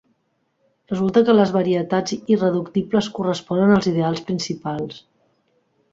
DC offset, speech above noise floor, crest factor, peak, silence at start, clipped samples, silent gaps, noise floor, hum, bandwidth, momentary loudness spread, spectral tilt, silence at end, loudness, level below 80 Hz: under 0.1%; 50 dB; 18 dB; -2 dBFS; 0.9 s; under 0.1%; none; -69 dBFS; none; 7.8 kHz; 11 LU; -6.5 dB/octave; 0.95 s; -20 LUFS; -58 dBFS